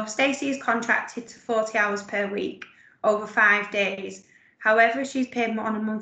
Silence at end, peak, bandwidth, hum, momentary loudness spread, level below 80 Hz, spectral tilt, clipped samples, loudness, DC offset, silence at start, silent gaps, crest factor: 0 s; -6 dBFS; 9 kHz; none; 14 LU; -72 dBFS; -3.5 dB/octave; under 0.1%; -23 LUFS; under 0.1%; 0 s; none; 20 dB